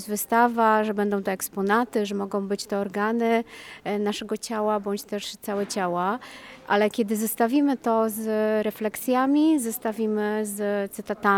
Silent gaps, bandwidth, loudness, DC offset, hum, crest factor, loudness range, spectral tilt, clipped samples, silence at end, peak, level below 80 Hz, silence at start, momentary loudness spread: none; 19.5 kHz; -25 LUFS; under 0.1%; none; 18 dB; 4 LU; -4.5 dB/octave; under 0.1%; 0 s; -8 dBFS; -66 dBFS; 0 s; 9 LU